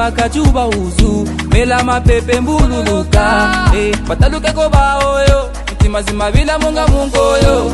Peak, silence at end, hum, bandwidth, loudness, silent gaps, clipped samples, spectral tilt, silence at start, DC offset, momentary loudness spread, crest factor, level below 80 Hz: 0 dBFS; 0 s; none; 12 kHz; -12 LUFS; none; under 0.1%; -5.5 dB/octave; 0 s; under 0.1%; 4 LU; 12 dB; -16 dBFS